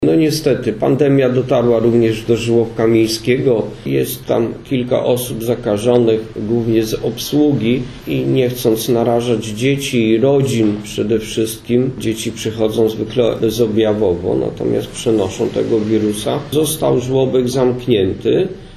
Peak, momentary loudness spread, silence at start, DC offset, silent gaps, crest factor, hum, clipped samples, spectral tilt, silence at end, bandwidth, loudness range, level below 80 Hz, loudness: 0 dBFS; 6 LU; 0 s; under 0.1%; none; 14 dB; none; under 0.1%; -6 dB/octave; 0 s; 13.5 kHz; 2 LU; -42 dBFS; -16 LUFS